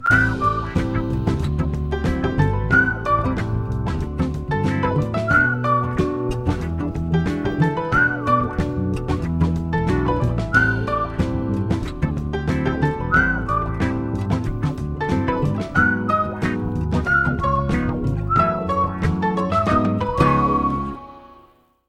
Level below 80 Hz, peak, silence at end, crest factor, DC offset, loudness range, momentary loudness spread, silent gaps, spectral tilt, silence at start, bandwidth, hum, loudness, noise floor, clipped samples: -32 dBFS; -2 dBFS; 0.55 s; 18 dB; under 0.1%; 2 LU; 7 LU; none; -7.5 dB/octave; 0 s; 11.5 kHz; none; -21 LUFS; -53 dBFS; under 0.1%